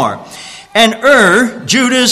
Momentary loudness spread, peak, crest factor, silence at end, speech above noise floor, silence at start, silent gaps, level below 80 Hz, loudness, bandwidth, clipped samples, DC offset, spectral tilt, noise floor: 20 LU; 0 dBFS; 10 dB; 0 s; 22 dB; 0 s; none; -50 dBFS; -9 LUFS; 14.5 kHz; 0.1%; under 0.1%; -2.5 dB/octave; -31 dBFS